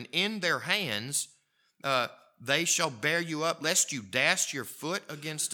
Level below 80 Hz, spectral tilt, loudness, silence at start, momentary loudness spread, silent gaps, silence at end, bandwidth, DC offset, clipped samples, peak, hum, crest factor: -84 dBFS; -1.5 dB/octave; -29 LUFS; 0 s; 10 LU; none; 0 s; 19 kHz; under 0.1%; under 0.1%; -8 dBFS; none; 24 dB